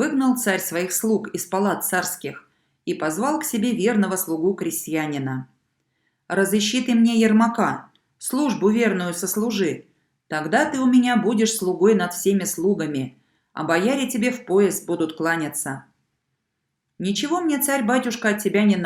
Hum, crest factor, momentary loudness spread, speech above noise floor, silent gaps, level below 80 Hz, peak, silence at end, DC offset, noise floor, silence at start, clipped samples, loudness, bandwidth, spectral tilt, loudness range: none; 16 dB; 11 LU; 56 dB; none; -68 dBFS; -4 dBFS; 0 s; under 0.1%; -77 dBFS; 0 s; under 0.1%; -21 LUFS; 18 kHz; -4.5 dB/octave; 4 LU